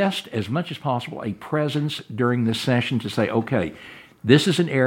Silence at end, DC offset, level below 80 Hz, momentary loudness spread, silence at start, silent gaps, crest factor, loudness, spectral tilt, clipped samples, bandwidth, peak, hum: 0 s; under 0.1%; -60 dBFS; 13 LU; 0 s; none; 22 dB; -23 LUFS; -6 dB/octave; under 0.1%; 17 kHz; 0 dBFS; none